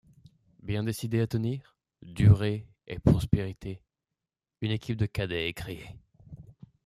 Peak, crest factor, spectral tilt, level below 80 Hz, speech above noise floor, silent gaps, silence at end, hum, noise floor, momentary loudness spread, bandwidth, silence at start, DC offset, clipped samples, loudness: -8 dBFS; 22 dB; -7 dB/octave; -46 dBFS; 61 dB; none; 0.45 s; none; -89 dBFS; 22 LU; 14 kHz; 0.65 s; under 0.1%; under 0.1%; -29 LUFS